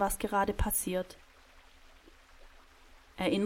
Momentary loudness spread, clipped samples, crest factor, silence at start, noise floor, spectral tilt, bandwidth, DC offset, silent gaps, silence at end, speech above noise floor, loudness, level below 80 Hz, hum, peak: 20 LU; under 0.1%; 20 dB; 0 s; -58 dBFS; -4 dB/octave; 16.5 kHz; under 0.1%; none; 0 s; 27 dB; -32 LUFS; -46 dBFS; none; -16 dBFS